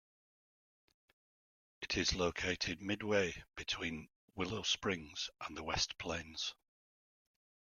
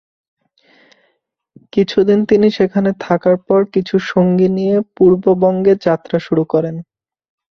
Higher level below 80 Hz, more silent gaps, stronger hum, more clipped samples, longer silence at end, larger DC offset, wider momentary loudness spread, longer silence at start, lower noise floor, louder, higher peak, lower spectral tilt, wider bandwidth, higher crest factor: second, -60 dBFS vs -54 dBFS; first, 4.16-4.28 s vs none; neither; neither; first, 1.25 s vs 0.75 s; neither; first, 9 LU vs 6 LU; about the same, 1.8 s vs 1.75 s; first, under -90 dBFS vs -66 dBFS; second, -38 LUFS vs -14 LUFS; second, -18 dBFS vs -2 dBFS; second, -3 dB/octave vs -8.5 dB/octave; first, 14 kHz vs 6.4 kHz; first, 24 dB vs 14 dB